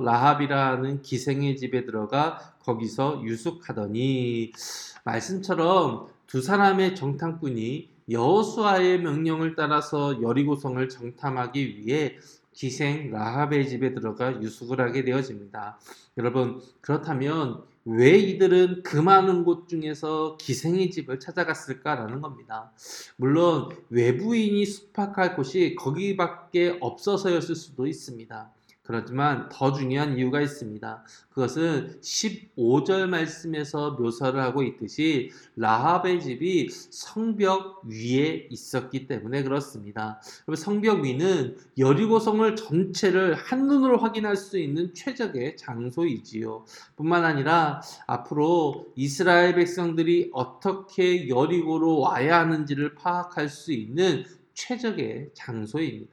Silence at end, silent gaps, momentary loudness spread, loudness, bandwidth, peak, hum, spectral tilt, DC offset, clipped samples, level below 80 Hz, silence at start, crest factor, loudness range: 0.05 s; none; 13 LU; -25 LUFS; 13 kHz; -4 dBFS; none; -6 dB/octave; under 0.1%; under 0.1%; -72 dBFS; 0 s; 22 dB; 6 LU